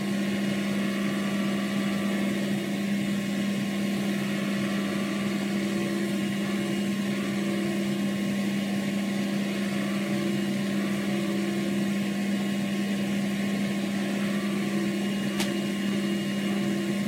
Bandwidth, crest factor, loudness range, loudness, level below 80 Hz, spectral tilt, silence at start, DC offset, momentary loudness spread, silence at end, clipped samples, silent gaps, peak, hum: 16 kHz; 18 dB; 0 LU; -28 LUFS; -66 dBFS; -5.5 dB/octave; 0 s; under 0.1%; 1 LU; 0 s; under 0.1%; none; -8 dBFS; none